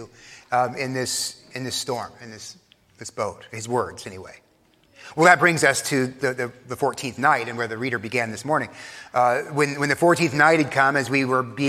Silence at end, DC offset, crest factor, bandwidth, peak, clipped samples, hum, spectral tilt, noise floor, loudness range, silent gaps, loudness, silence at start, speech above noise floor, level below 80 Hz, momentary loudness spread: 0 s; under 0.1%; 22 dB; 16 kHz; 0 dBFS; under 0.1%; none; -4 dB/octave; -60 dBFS; 10 LU; none; -22 LUFS; 0 s; 37 dB; -66 dBFS; 20 LU